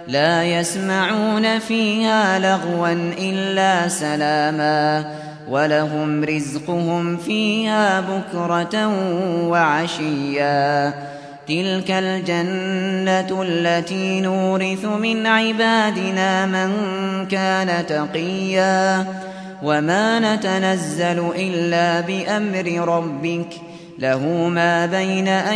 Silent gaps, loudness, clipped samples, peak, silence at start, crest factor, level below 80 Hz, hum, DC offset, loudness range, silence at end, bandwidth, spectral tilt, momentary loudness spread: none; -19 LUFS; under 0.1%; -4 dBFS; 0 s; 16 dB; -66 dBFS; none; under 0.1%; 2 LU; 0 s; 11 kHz; -5 dB/octave; 7 LU